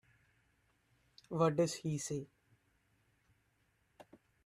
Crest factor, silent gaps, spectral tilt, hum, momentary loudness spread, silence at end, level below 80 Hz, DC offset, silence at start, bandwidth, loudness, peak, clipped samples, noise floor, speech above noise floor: 24 dB; none; -5.5 dB/octave; none; 12 LU; 0.45 s; -76 dBFS; under 0.1%; 1.3 s; 14 kHz; -37 LUFS; -18 dBFS; under 0.1%; -77 dBFS; 42 dB